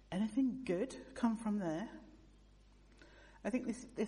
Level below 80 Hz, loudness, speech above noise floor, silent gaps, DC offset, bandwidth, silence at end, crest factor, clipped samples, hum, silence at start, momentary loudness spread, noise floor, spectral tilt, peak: -64 dBFS; -39 LUFS; 25 dB; none; under 0.1%; 11 kHz; 0 s; 20 dB; under 0.1%; 50 Hz at -65 dBFS; 0.1 s; 11 LU; -63 dBFS; -6.5 dB/octave; -22 dBFS